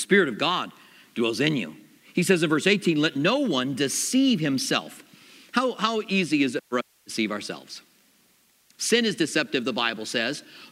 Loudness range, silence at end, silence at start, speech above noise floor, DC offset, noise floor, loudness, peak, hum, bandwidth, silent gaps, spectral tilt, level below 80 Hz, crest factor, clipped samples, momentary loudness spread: 4 LU; 0.05 s; 0 s; 38 dB; under 0.1%; -62 dBFS; -24 LUFS; -4 dBFS; none; 16 kHz; none; -4 dB/octave; -76 dBFS; 22 dB; under 0.1%; 12 LU